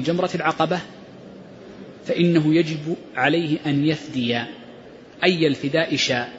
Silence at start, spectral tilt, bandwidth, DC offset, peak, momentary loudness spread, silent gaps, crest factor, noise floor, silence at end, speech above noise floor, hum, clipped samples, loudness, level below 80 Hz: 0 s; -5.5 dB/octave; 8 kHz; under 0.1%; -4 dBFS; 23 LU; none; 18 dB; -43 dBFS; 0 s; 22 dB; none; under 0.1%; -21 LUFS; -62 dBFS